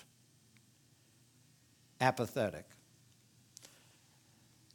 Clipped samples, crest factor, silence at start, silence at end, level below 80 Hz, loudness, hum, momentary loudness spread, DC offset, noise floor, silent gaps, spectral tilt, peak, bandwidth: under 0.1%; 30 dB; 2 s; 1.1 s; -76 dBFS; -36 LUFS; none; 26 LU; under 0.1%; -68 dBFS; none; -5 dB/octave; -14 dBFS; 19 kHz